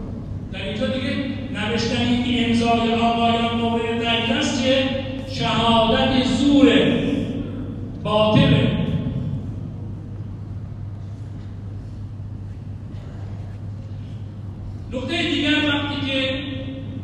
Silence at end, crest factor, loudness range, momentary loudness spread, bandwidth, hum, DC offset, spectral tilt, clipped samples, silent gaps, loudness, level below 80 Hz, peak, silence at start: 0 s; 20 dB; 15 LU; 17 LU; 9.6 kHz; none; under 0.1%; -6 dB/octave; under 0.1%; none; -20 LUFS; -40 dBFS; -2 dBFS; 0 s